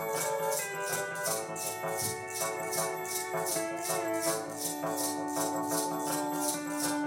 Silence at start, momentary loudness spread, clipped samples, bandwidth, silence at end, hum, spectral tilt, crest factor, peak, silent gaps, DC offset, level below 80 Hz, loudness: 0 s; 3 LU; under 0.1%; 17.5 kHz; 0 s; none; -2.5 dB/octave; 16 dB; -18 dBFS; none; under 0.1%; -74 dBFS; -32 LUFS